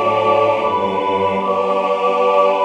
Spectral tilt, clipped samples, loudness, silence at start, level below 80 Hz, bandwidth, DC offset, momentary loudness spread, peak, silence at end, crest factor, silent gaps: -6 dB/octave; under 0.1%; -16 LUFS; 0 s; -60 dBFS; 9.4 kHz; under 0.1%; 4 LU; -2 dBFS; 0 s; 14 dB; none